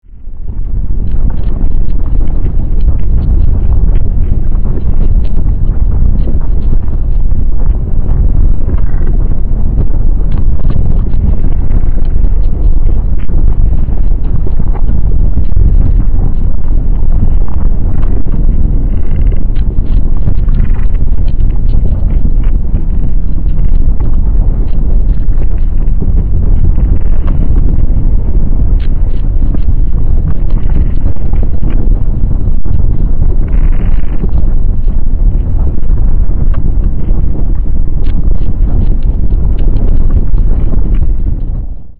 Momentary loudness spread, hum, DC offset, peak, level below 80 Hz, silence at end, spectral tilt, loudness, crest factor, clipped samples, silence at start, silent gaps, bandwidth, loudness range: 3 LU; none; 10%; 0 dBFS; -8 dBFS; 0 s; -11.5 dB/octave; -14 LUFS; 6 dB; under 0.1%; 0 s; none; 2 kHz; 1 LU